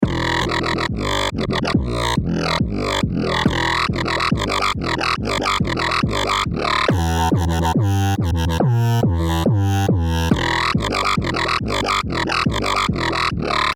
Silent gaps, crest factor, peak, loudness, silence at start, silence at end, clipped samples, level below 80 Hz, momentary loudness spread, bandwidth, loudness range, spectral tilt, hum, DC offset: none; 16 dB; -2 dBFS; -19 LUFS; 0 s; 0 s; under 0.1%; -32 dBFS; 2 LU; 17.5 kHz; 1 LU; -5 dB/octave; none; under 0.1%